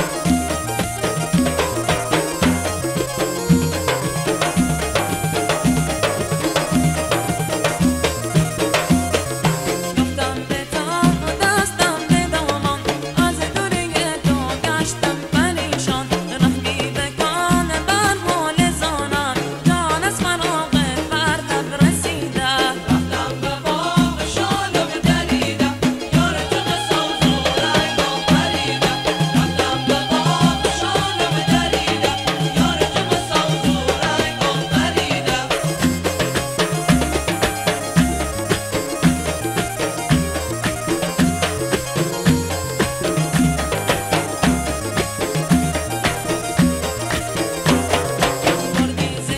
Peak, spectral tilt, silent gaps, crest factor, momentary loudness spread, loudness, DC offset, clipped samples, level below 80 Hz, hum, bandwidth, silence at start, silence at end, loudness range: 0 dBFS; -4.5 dB/octave; none; 18 dB; 5 LU; -19 LUFS; under 0.1%; under 0.1%; -34 dBFS; none; 16 kHz; 0 s; 0 s; 2 LU